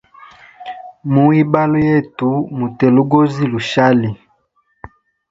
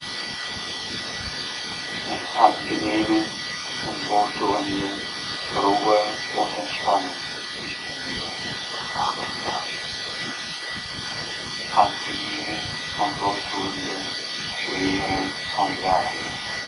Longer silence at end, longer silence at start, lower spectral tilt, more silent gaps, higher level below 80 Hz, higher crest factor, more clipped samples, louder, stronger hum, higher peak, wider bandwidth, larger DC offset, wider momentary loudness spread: first, 1.15 s vs 0 s; first, 0.6 s vs 0 s; first, -8 dB/octave vs -3 dB/octave; neither; about the same, -50 dBFS vs -52 dBFS; second, 16 dB vs 24 dB; neither; first, -14 LUFS vs -25 LUFS; neither; about the same, 0 dBFS vs 0 dBFS; second, 7.8 kHz vs 11 kHz; neither; first, 19 LU vs 8 LU